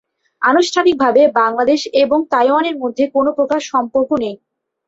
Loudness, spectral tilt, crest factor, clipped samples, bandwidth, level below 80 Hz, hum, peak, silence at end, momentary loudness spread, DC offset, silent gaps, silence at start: -15 LUFS; -3.5 dB/octave; 14 dB; under 0.1%; 8 kHz; -58 dBFS; none; -2 dBFS; 0.5 s; 7 LU; under 0.1%; none; 0.4 s